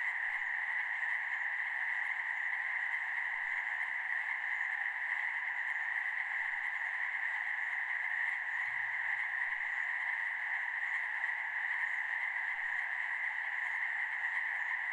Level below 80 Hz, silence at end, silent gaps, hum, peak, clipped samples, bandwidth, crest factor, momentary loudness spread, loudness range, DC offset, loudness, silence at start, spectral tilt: -80 dBFS; 0 s; none; none; -24 dBFS; under 0.1%; 11.5 kHz; 14 dB; 1 LU; 0 LU; under 0.1%; -34 LUFS; 0 s; 0.5 dB/octave